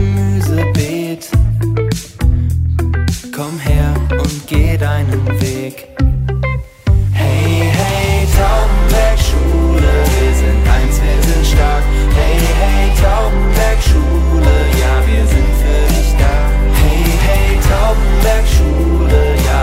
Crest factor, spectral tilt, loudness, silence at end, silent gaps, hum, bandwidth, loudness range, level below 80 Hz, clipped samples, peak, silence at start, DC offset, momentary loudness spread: 10 dB; -6 dB/octave; -13 LUFS; 0 s; none; none; 16.5 kHz; 3 LU; -12 dBFS; under 0.1%; 0 dBFS; 0 s; under 0.1%; 5 LU